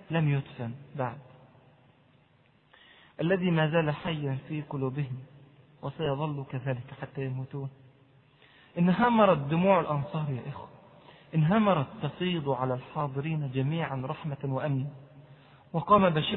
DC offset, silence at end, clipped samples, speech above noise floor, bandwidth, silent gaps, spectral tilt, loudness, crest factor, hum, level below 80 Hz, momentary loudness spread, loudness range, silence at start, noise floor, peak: under 0.1%; 0 s; under 0.1%; 36 dB; 4.2 kHz; none; -11 dB/octave; -29 LUFS; 22 dB; none; -62 dBFS; 16 LU; 8 LU; 0.1 s; -64 dBFS; -8 dBFS